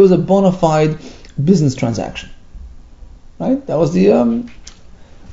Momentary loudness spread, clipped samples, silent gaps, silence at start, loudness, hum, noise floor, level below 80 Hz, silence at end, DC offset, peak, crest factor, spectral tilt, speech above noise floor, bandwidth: 16 LU; under 0.1%; none; 0 s; -15 LUFS; none; -38 dBFS; -38 dBFS; 0 s; under 0.1%; 0 dBFS; 16 dB; -7.5 dB/octave; 24 dB; 7.8 kHz